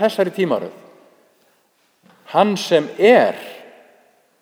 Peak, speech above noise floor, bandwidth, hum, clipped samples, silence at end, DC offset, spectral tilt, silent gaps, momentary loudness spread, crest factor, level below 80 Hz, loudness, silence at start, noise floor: 0 dBFS; 45 dB; over 20 kHz; none; under 0.1%; 0.8 s; under 0.1%; -5 dB/octave; none; 19 LU; 20 dB; -74 dBFS; -17 LUFS; 0 s; -61 dBFS